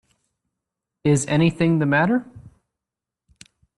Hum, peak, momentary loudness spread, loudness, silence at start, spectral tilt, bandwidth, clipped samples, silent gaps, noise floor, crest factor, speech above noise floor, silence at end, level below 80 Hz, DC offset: none; -6 dBFS; 6 LU; -20 LUFS; 1.05 s; -6 dB/octave; 11.5 kHz; under 0.1%; none; -87 dBFS; 18 dB; 69 dB; 1.4 s; -58 dBFS; under 0.1%